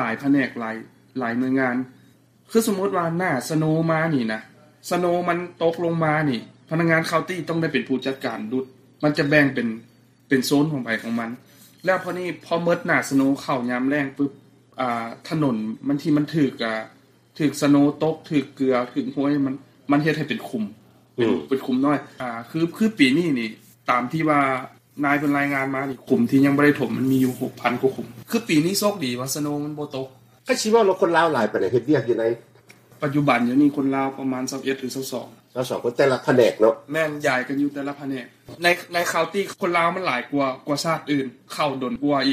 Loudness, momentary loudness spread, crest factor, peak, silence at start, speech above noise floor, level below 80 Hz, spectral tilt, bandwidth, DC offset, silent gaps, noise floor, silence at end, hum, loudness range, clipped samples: -22 LUFS; 12 LU; 20 dB; -2 dBFS; 0 s; 33 dB; -64 dBFS; -5.5 dB/octave; 15.5 kHz; under 0.1%; none; -55 dBFS; 0 s; none; 3 LU; under 0.1%